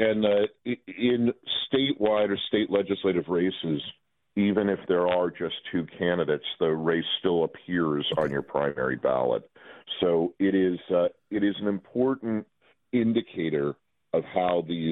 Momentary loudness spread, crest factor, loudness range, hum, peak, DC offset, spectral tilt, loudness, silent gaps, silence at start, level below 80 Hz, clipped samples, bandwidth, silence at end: 7 LU; 18 dB; 2 LU; none; -8 dBFS; under 0.1%; -8.5 dB/octave; -27 LUFS; none; 0 s; -64 dBFS; under 0.1%; 4.1 kHz; 0 s